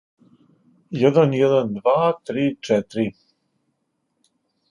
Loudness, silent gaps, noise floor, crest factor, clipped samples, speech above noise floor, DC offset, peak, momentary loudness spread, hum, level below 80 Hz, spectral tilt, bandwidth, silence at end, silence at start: -20 LUFS; none; -73 dBFS; 20 dB; under 0.1%; 54 dB; under 0.1%; -2 dBFS; 9 LU; none; -64 dBFS; -7.5 dB/octave; 11 kHz; 1.6 s; 0.9 s